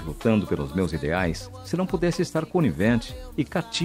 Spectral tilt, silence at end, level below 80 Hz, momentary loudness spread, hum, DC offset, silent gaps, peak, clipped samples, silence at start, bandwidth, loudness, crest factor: -6 dB/octave; 0 s; -42 dBFS; 7 LU; none; under 0.1%; none; -8 dBFS; under 0.1%; 0 s; 16 kHz; -25 LUFS; 16 dB